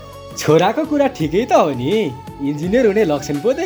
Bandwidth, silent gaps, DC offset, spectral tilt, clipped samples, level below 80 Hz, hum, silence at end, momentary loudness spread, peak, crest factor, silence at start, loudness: over 20 kHz; none; under 0.1%; -6 dB/octave; under 0.1%; -44 dBFS; none; 0 s; 10 LU; 0 dBFS; 16 dB; 0 s; -17 LUFS